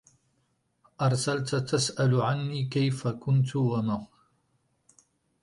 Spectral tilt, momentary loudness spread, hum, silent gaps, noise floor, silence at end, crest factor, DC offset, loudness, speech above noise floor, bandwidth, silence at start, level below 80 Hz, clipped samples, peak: -5.5 dB/octave; 5 LU; none; none; -73 dBFS; 1.4 s; 16 dB; under 0.1%; -28 LUFS; 47 dB; 11.5 kHz; 1 s; -64 dBFS; under 0.1%; -12 dBFS